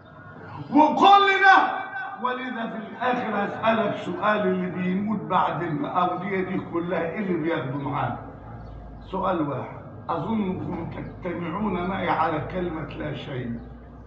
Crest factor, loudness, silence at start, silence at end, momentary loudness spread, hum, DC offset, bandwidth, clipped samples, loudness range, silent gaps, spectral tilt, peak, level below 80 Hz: 20 dB; -24 LUFS; 0.05 s; 0 s; 20 LU; none; under 0.1%; 7.8 kHz; under 0.1%; 9 LU; none; -7 dB/octave; -4 dBFS; -50 dBFS